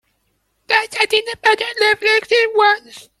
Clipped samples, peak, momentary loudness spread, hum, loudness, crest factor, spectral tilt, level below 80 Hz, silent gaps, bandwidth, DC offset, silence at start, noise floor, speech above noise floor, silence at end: under 0.1%; 0 dBFS; 4 LU; none; -15 LUFS; 18 dB; -0.5 dB/octave; -62 dBFS; none; 13.5 kHz; under 0.1%; 0.7 s; -66 dBFS; 50 dB; 0.2 s